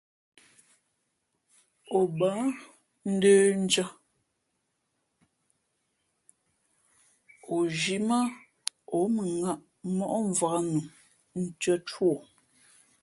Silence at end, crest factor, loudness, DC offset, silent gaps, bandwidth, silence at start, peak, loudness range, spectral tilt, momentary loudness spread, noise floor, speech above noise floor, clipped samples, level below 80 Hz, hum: 0.8 s; 26 dB; -28 LUFS; under 0.1%; none; 11.5 kHz; 1.9 s; -4 dBFS; 7 LU; -4.5 dB/octave; 14 LU; -79 dBFS; 52 dB; under 0.1%; -74 dBFS; none